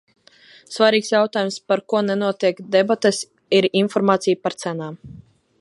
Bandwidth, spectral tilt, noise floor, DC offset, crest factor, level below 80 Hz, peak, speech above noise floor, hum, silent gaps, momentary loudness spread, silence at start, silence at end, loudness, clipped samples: 11.5 kHz; -4.5 dB/octave; -50 dBFS; under 0.1%; 18 dB; -64 dBFS; -2 dBFS; 31 dB; none; none; 11 LU; 0.7 s; 0.4 s; -19 LUFS; under 0.1%